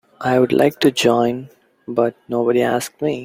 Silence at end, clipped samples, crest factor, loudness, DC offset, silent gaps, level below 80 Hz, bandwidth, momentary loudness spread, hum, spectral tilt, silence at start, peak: 0 s; under 0.1%; 18 dB; -18 LUFS; under 0.1%; none; -58 dBFS; 16.5 kHz; 7 LU; none; -5 dB/octave; 0.2 s; 0 dBFS